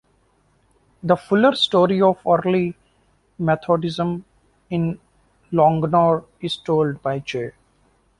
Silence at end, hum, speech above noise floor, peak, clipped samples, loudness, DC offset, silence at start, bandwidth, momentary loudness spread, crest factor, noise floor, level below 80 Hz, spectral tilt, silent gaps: 0.7 s; none; 43 dB; -2 dBFS; under 0.1%; -20 LUFS; under 0.1%; 1.05 s; 11.5 kHz; 12 LU; 18 dB; -61 dBFS; -56 dBFS; -7 dB/octave; none